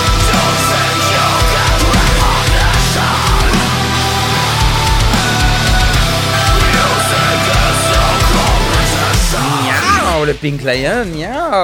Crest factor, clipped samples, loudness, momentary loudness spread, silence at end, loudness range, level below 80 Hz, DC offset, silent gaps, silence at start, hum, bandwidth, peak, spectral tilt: 12 dB; under 0.1%; -12 LUFS; 3 LU; 0 s; 1 LU; -18 dBFS; under 0.1%; none; 0 s; none; 17 kHz; 0 dBFS; -3.5 dB/octave